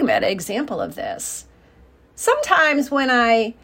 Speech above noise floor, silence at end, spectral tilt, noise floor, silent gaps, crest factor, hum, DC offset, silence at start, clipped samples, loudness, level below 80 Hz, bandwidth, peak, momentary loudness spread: 32 dB; 0.1 s; -3 dB/octave; -51 dBFS; none; 20 dB; none; under 0.1%; 0 s; under 0.1%; -19 LUFS; -54 dBFS; 16.5 kHz; 0 dBFS; 12 LU